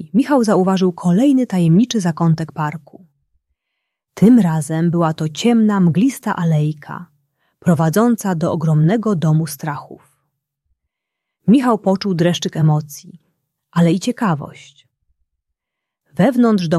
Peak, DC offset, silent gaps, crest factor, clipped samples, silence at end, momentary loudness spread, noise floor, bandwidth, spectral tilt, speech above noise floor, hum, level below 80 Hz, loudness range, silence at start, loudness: -2 dBFS; under 0.1%; none; 14 dB; under 0.1%; 0 s; 11 LU; -81 dBFS; 14 kHz; -7 dB/octave; 66 dB; none; -58 dBFS; 4 LU; 0 s; -16 LUFS